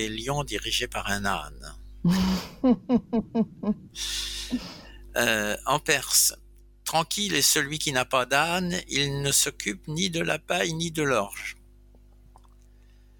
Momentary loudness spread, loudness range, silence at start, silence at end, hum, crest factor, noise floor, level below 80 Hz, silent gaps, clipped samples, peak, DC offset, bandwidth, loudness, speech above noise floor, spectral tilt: 12 LU; 4 LU; 0 s; 1.65 s; 50 Hz at -50 dBFS; 22 dB; -53 dBFS; -48 dBFS; none; under 0.1%; -6 dBFS; under 0.1%; 18 kHz; -25 LUFS; 27 dB; -3 dB/octave